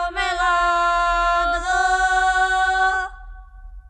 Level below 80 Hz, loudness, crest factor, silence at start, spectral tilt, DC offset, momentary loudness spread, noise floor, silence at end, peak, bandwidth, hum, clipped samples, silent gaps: -36 dBFS; -19 LUFS; 12 dB; 0 s; -2 dB/octave; under 0.1%; 3 LU; -39 dBFS; 0.1 s; -8 dBFS; 10.5 kHz; none; under 0.1%; none